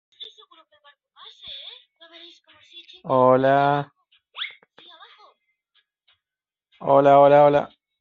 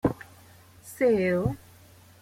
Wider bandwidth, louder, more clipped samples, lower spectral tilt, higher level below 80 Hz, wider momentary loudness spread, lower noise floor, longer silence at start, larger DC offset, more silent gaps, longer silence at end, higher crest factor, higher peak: second, 4.8 kHz vs 16.5 kHz; first, -17 LUFS vs -26 LUFS; neither; second, -4.5 dB/octave vs -7.5 dB/octave; second, -68 dBFS vs -52 dBFS; first, 27 LU vs 24 LU; first, under -90 dBFS vs -53 dBFS; first, 0.2 s vs 0.05 s; neither; neither; second, 0.35 s vs 0.65 s; about the same, 20 dB vs 20 dB; first, -4 dBFS vs -10 dBFS